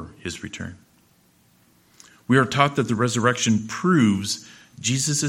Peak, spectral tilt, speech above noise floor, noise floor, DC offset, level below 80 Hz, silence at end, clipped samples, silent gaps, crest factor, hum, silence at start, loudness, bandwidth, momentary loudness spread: 0 dBFS; -4.5 dB/octave; 38 dB; -59 dBFS; under 0.1%; -58 dBFS; 0 s; under 0.1%; none; 22 dB; none; 0 s; -21 LUFS; 16 kHz; 15 LU